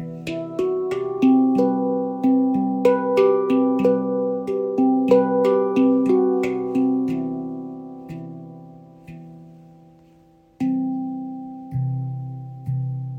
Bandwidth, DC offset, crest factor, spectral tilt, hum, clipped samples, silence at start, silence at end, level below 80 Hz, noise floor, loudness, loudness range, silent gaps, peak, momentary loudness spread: 7.8 kHz; under 0.1%; 18 dB; -9 dB/octave; none; under 0.1%; 0 s; 0 s; -60 dBFS; -53 dBFS; -21 LUFS; 12 LU; none; -4 dBFS; 18 LU